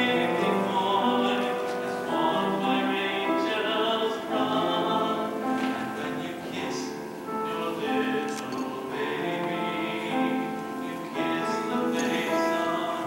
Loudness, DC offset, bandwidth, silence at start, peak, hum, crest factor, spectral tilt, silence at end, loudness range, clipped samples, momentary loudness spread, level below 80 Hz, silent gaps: -27 LUFS; under 0.1%; 16 kHz; 0 s; -12 dBFS; none; 14 dB; -4.5 dB/octave; 0 s; 4 LU; under 0.1%; 7 LU; -68 dBFS; none